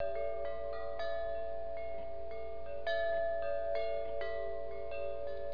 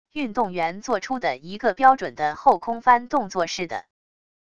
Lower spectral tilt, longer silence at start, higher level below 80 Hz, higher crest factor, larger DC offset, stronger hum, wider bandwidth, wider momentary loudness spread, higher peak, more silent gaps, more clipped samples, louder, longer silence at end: second, -2.5 dB/octave vs -4 dB/octave; second, 0 s vs 0.15 s; about the same, -56 dBFS vs -60 dBFS; second, 12 dB vs 20 dB; about the same, 1% vs 0.5%; neither; second, 5.2 kHz vs 8 kHz; about the same, 9 LU vs 10 LU; second, -24 dBFS vs -2 dBFS; neither; neither; second, -39 LUFS vs -22 LUFS; second, 0 s vs 0.75 s